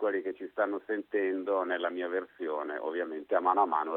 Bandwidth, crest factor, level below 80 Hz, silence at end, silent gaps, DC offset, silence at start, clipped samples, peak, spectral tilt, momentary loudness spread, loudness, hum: 4.2 kHz; 20 dB; -82 dBFS; 0 s; none; under 0.1%; 0 s; under 0.1%; -12 dBFS; -7 dB/octave; 8 LU; -32 LUFS; none